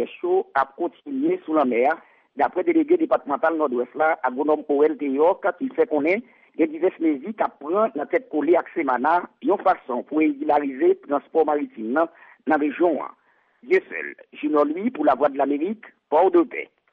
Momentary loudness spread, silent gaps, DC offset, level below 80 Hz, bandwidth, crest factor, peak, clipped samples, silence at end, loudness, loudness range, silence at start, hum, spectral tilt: 7 LU; none; under 0.1%; -70 dBFS; 5 kHz; 14 dB; -8 dBFS; under 0.1%; 0.3 s; -22 LUFS; 2 LU; 0 s; none; -8 dB/octave